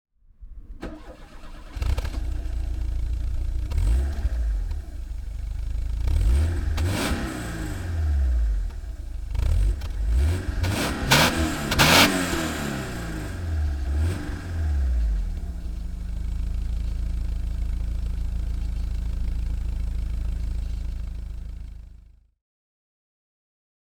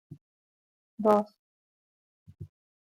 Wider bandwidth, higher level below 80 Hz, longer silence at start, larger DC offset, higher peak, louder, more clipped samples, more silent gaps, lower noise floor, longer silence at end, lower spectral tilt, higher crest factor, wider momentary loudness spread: first, over 20 kHz vs 15 kHz; first, -26 dBFS vs -74 dBFS; first, 0.4 s vs 0.1 s; neither; first, -2 dBFS vs -10 dBFS; about the same, -26 LUFS vs -26 LUFS; neither; second, none vs 0.21-0.98 s, 1.39-2.26 s; second, -49 dBFS vs under -90 dBFS; first, 1.8 s vs 0.35 s; second, -4.5 dB/octave vs -8 dB/octave; about the same, 24 dB vs 24 dB; second, 14 LU vs 25 LU